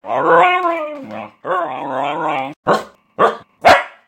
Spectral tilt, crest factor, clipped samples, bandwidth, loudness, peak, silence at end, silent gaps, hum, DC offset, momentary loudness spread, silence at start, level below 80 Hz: -4.5 dB/octave; 16 dB; under 0.1%; 16.5 kHz; -16 LUFS; 0 dBFS; 0.2 s; 2.56-2.63 s; none; under 0.1%; 16 LU; 0.05 s; -54 dBFS